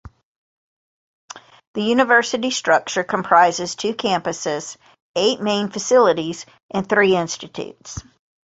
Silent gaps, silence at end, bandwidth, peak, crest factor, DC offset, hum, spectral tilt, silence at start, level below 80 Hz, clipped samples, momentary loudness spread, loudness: 0.23-1.28 s, 1.67-1.74 s, 5.02-5.14 s, 6.63-6.69 s; 0.45 s; 8 kHz; -2 dBFS; 20 dB; under 0.1%; none; -3.5 dB/octave; 0.05 s; -54 dBFS; under 0.1%; 20 LU; -19 LUFS